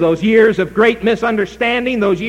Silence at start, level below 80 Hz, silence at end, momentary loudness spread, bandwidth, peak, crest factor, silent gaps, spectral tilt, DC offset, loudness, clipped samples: 0 s; -44 dBFS; 0 s; 5 LU; 10 kHz; 0 dBFS; 14 dB; none; -6.5 dB/octave; under 0.1%; -14 LUFS; under 0.1%